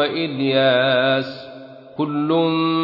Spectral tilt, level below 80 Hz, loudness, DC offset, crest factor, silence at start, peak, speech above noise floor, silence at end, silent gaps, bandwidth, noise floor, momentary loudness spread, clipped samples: -8 dB/octave; -66 dBFS; -18 LUFS; under 0.1%; 14 dB; 0 s; -6 dBFS; 20 dB; 0 s; none; 5.8 kHz; -39 dBFS; 20 LU; under 0.1%